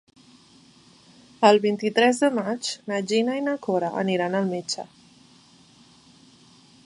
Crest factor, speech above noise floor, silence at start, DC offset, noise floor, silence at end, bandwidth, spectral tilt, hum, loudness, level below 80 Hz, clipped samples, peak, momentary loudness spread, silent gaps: 22 dB; 32 dB; 1.4 s; under 0.1%; -54 dBFS; 2.05 s; 11.5 kHz; -4.5 dB/octave; none; -23 LUFS; -74 dBFS; under 0.1%; -4 dBFS; 11 LU; none